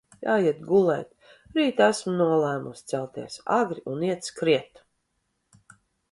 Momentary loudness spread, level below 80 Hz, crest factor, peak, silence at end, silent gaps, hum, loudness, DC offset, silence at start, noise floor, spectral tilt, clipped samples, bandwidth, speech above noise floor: 10 LU; -68 dBFS; 22 dB; -4 dBFS; 1.5 s; none; none; -25 LUFS; under 0.1%; 0.2 s; -76 dBFS; -5.5 dB/octave; under 0.1%; 11.5 kHz; 51 dB